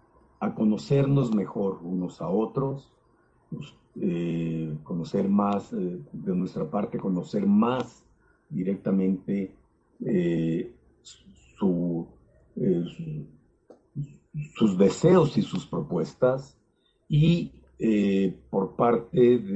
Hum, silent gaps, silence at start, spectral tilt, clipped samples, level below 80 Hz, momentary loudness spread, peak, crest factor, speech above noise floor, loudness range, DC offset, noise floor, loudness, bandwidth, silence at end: none; none; 0.4 s; -8 dB/octave; under 0.1%; -56 dBFS; 16 LU; -8 dBFS; 18 dB; 43 dB; 6 LU; under 0.1%; -68 dBFS; -26 LUFS; 8.2 kHz; 0 s